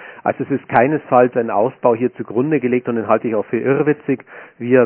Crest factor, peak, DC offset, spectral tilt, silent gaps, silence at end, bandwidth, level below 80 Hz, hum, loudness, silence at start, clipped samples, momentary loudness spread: 16 dB; 0 dBFS; under 0.1%; -11.5 dB/octave; none; 0 s; 4 kHz; -60 dBFS; none; -17 LUFS; 0 s; under 0.1%; 8 LU